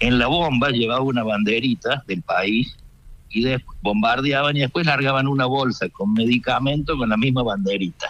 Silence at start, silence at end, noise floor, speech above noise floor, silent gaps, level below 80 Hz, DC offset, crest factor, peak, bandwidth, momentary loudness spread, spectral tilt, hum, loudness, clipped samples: 0 s; 0 s; -43 dBFS; 23 dB; none; -40 dBFS; under 0.1%; 16 dB; -6 dBFS; 8.8 kHz; 5 LU; -6.5 dB/octave; none; -20 LUFS; under 0.1%